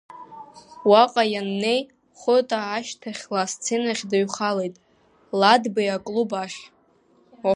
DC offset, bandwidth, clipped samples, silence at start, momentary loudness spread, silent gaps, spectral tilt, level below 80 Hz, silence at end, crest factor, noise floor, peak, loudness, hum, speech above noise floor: under 0.1%; 11 kHz; under 0.1%; 0.1 s; 17 LU; none; -3.5 dB/octave; -72 dBFS; 0 s; 20 dB; -60 dBFS; -2 dBFS; -22 LUFS; none; 38 dB